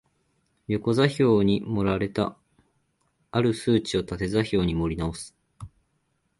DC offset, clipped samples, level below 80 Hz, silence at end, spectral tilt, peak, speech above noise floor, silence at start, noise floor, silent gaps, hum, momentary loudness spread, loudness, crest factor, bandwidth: under 0.1%; under 0.1%; -46 dBFS; 0.7 s; -6.5 dB/octave; -6 dBFS; 48 dB; 0.7 s; -72 dBFS; none; none; 10 LU; -25 LUFS; 20 dB; 11.5 kHz